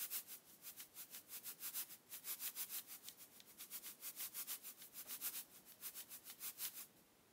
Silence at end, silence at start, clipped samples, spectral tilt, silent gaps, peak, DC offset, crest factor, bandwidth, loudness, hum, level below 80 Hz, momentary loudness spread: 0 s; 0 s; under 0.1%; 1 dB/octave; none; -32 dBFS; under 0.1%; 22 dB; 16 kHz; -49 LUFS; none; under -90 dBFS; 10 LU